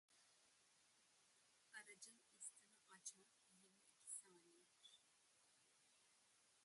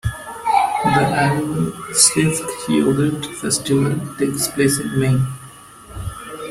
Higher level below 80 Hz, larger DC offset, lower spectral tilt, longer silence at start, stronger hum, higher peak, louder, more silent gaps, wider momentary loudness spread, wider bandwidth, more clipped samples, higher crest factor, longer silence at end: second, under -90 dBFS vs -44 dBFS; neither; second, 0.5 dB/octave vs -4 dB/octave; about the same, 0.1 s vs 0.05 s; neither; second, -40 dBFS vs 0 dBFS; second, -60 LUFS vs -18 LUFS; neither; second, 13 LU vs 17 LU; second, 11.5 kHz vs 16 kHz; neither; first, 28 dB vs 18 dB; about the same, 0 s vs 0 s